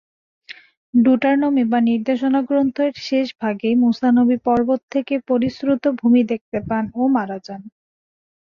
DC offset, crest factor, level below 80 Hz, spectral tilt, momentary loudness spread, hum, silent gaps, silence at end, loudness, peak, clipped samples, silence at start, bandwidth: under 0.1%; 14 dB; -56 dBFS; -7 dB/octave; 8 LU; none; 0.77-0.93 s, 4.83-4.88 s, 6.41-6.52 s; 0.8 s; -18 LUFS; -6 dBFS; under 0.1%; 0.5 s; 6.8 kHz